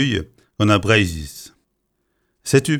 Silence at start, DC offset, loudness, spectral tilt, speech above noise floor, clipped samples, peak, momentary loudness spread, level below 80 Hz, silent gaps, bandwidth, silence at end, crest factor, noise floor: 0 s; under 0.1%; -18 LUFS; -5 dB/octave; 53 dB; under 0.1%; 0 dBFS; 21 LU; -42 dBFS; none; 16 kHz; 0 s; 20 dB; -71 dBFS